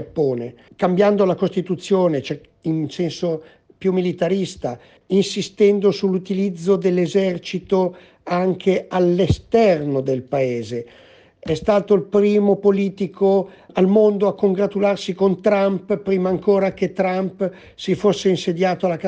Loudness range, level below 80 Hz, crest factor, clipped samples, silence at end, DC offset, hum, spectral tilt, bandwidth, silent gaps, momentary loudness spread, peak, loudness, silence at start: 4 LU; -48 dBFS; 16 dB; under 0.1%; 0 s; under 0.1%; none; -7 dB/octave; 9.2 kHz; none; 10 LU; -4 dBFS; -19 LUFS; 0 s